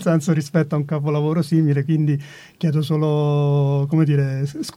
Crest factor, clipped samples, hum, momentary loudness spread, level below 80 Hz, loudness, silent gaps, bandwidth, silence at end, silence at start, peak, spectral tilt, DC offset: 14 dB; under 0.1%; none; 5 LU; -62 dBFS; -20 LUFS; none; 12.5 kHz; 0.05 s; 0 s; -6 dBFS; -8 dB/octave; under 0.1%